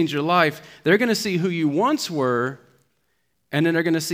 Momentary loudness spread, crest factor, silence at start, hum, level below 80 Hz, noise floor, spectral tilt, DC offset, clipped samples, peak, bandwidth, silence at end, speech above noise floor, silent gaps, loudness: 6 LU; 20 dB; 0 s; none; -70 dBFS; -72 dBFS; -5 dB/octave; under 0.1%; under 0.1%; -2 dBFS; 16.5 kHz; 0 s; 51 dB; none; -21 LUFS